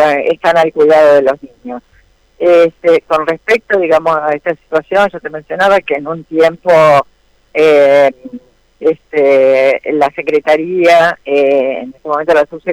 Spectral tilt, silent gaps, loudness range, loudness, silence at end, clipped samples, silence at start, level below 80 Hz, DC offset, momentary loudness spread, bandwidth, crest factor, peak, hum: -5.5 dB/octave; none; 2 LU; -11 LUFS; 0 s; under 0.1%; 0 s; -52 dBFS; under 0.1%; 12 LU; 13.5 kHz; 8 dB; -2 dBFS; none